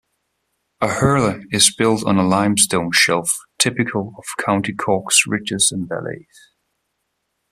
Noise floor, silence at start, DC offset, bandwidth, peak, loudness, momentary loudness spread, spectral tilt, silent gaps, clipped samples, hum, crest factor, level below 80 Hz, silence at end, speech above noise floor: -73 dBFS; 0.8 s; under 0.1%; 15.5 kHz; 0 dBFS; -17 LUFS; 11 LU; -3 dB/octave; none; under 0.1%; none; 20 dB; -52 dBFS; 1.3 s; 55 dB